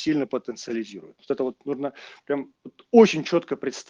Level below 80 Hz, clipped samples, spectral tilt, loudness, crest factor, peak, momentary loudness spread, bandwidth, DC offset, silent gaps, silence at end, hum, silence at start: -70 dBFS; under 0.1%; -5.5 dB/octave; -24 LUFS; 22 dB; -2 dBFS; 16 LU; 7.6 kHz; under 0.1%; none; 0.05 s; none; 0 s